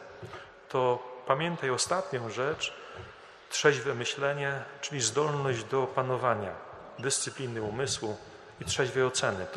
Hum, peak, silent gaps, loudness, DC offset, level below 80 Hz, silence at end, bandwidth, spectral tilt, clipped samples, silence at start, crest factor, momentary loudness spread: none; -8 dBFS; none; -30 LUFS; under 0.1%; -64 dBFS; 0 s; 13 kHz; -3.5 dB/octave; under 0.1%; 0 s; 24 dB; 17 LU